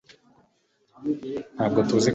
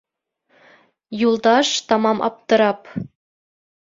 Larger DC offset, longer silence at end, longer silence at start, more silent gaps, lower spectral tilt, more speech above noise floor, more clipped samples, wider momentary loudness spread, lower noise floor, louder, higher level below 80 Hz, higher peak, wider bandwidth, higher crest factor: neither; second, 0 s vs 0.8 s; about the same, 1 s vs 1.1 s; neither; first, -5.5 dB/octave vs -3.5 dB/octave; second, 43 dB vs 50 dB; neither; second, 13 LU vs 16 LU; about the same, -67 dBFS vs -67 dBFS; second, -26 LUFS vs -18 LUFS; about the same, -60 dBFS vs -62 dBFS; second, -8 dBFS vs -2 dBFS; about the same, 8.4 kHz vs 7.8 kHz; about the same, 20 dB vs 18 dB